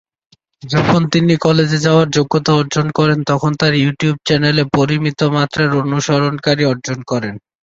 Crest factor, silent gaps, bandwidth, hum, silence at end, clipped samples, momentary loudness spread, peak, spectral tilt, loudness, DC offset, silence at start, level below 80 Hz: 14 dB; none; 7.8 kHz; none; 0.4 s; under 0.1%; 5 LU; 0 dBFS; -6 dB/octave; -14 LUFS; under 0.1%; 0.65 s; -48 dBFS